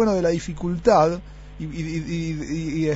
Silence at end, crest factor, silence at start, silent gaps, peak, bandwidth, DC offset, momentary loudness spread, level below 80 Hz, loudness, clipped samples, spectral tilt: 0 s; 18 dB; 0 s; none; -4 dBFS; 8 kHz; under 0.1%; 16 LU; -40 dBFS; -23 LUFS; under 0.1%; -6.5 dB/octave